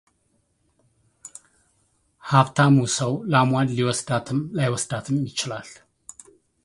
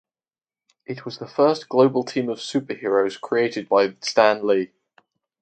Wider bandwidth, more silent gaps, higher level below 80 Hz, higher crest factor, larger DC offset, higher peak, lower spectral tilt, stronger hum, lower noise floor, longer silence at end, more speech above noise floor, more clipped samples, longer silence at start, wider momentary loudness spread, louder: first, 11.5 kHz vs 9 kHz; neither; first, -60 dBFS vs -72 dBFS; about the same, 24 dB vs 20 dB; neither; about the same, 0 dBFS vs -2 dBFS; about the same, -5 dB/octave vs -5 dB/octave; neither; second, -68 dBFS vs under -90 dBFS; first, 0.9 s vs 0.75 s; second, 47 dB vs over 69 dB; neither; first, 2.25 s vs 0.9 s; first, 25 LU vs 14 LU; about the same, -22 LUFS vs -21 LUFS